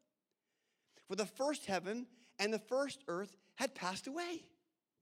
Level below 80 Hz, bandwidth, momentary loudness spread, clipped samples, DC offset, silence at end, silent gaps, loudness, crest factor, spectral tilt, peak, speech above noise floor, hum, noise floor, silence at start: -86 dBFS; 16.5 kHz; 8 LU; under 0.1%; under 0.1%; 0.55 s; none; -41 LUFS; 24 dB; -3.5 dB/octave; -20 dBFS; 48 dB; none; -89 dBFS; 1.1 s